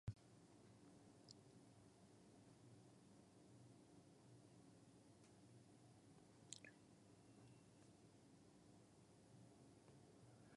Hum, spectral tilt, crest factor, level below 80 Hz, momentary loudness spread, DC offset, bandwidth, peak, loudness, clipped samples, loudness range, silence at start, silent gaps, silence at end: none; -5 dB/octave; 34 dB; -80 dBFS; 5 LU; under 0.1%; 11 kHz; -32 dBFS; -67 LUFS; under 0.1%; 3 LU; 0.05 s; none; 0 s